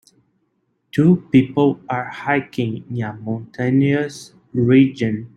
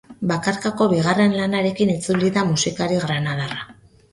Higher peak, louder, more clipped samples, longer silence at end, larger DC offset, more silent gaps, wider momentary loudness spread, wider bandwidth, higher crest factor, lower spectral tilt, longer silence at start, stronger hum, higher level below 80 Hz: about the same, -2 dBFS vs -4 dBFS; about the same, -19 LUFS vs -20 LUFS; neither; second, 0.1 s vs 0.4 s; neither; neither; first, 13 LU vs 8 LU; about the same, 10.5 kHz vs 11.5 kHz; about the same, 16 dB vs 16 dB; first, -8 dB/octave vs -5 dB/octave; first, 0.95 s vs 0.1 s; neither; about the same, -56 dBFS vs -54 dBFS